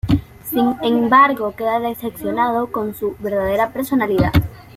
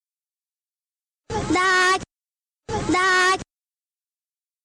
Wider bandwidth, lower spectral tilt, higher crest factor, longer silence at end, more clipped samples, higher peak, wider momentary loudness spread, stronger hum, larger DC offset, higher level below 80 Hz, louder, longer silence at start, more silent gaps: second, 16 kHz vs 18.5 kHz; first, -7 dB/octave vs -3 dB/octave; about the same, 16 dB vs 14 dB; second, 0.15 s vs 1.2 s; neither; first, -2 dBFS vs -12 dBFS; about the same, 11 LU vs 13 LU; neither; neither; first, -36 dBFS vs -48 dBFS; about the same, -18 LUFS vs -20 LUFS; second, 0.05 s vs 1.3 s; neither